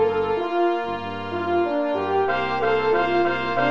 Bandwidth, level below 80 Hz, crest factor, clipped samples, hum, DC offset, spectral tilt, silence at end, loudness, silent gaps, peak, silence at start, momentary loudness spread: 7 kHz; -54 dBFS; 12 dB; under 0.1%; none; under 0.1%; -7 dB/octave; 0 s; -22 LUFS; none; -10 dBFS; 0 s; 7 LU